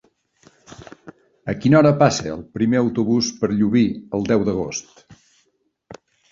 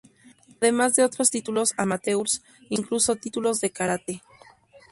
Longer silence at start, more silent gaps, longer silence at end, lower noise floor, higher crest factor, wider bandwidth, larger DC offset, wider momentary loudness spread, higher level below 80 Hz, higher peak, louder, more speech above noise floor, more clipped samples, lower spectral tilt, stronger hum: about the same, 0.7 s vs 0.6 s; neither; first, 0.4 s vs 0.15 s; first, -67 dBFS vs -54 dBFS; about the same, 20 dB vs 20 dB; second, 7.6 kHz vs 12 kHz; neither; first, 15 LU vs 10 LU; first, -50 dBFS vs -64 dBFS; first, 0 dBFS vs -6 dBFS; first, -19 LUFS vs -24 LUFS; first, 49 dB vs 30 dB; neither; first, -6 dB/octave vs -3 dB/octave; neither